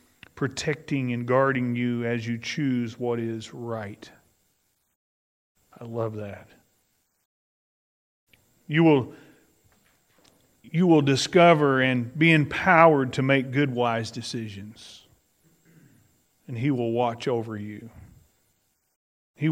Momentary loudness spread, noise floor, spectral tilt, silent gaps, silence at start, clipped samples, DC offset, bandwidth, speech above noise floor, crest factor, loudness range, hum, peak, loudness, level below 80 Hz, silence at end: 20 LU; -71 dBFS; -6 dB/octave; 4.95-5.55 s, 7.25-8.27 s, 18.96-19.34 s; 0.35 s; under 0.1%; under 0.1%; 15.5 kHz; 48 dB; 24 dB; 19 LU; none; 0 dBFS; -23 LUFS; -66 dBFS; 0 s